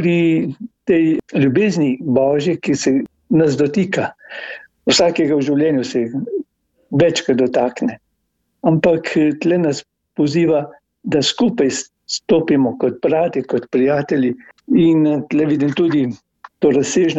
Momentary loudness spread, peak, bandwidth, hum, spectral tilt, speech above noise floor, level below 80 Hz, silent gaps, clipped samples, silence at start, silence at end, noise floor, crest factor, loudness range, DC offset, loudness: 10 LU; -2 dBFS; 8.2 kHz; none; -5.5 dB/octave; 54 dB; -56 dBFS; none; under 0.1%; 0 s; 0 s; -69 dBFS; 14 dB; 2 LU; under 0.1%; -17 LUFS